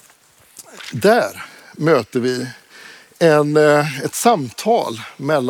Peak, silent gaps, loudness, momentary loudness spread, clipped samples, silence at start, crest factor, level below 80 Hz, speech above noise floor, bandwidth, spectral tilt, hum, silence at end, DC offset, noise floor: -2 dBFS; none; -17 LUFS; 16 LU; under 0.1%; 0.55 s; 16 dB; -68 dBFS; 35 dB; 18.5 kHz; -5 dB/octave; none; 0 s; under 0.1%; -51 dBFS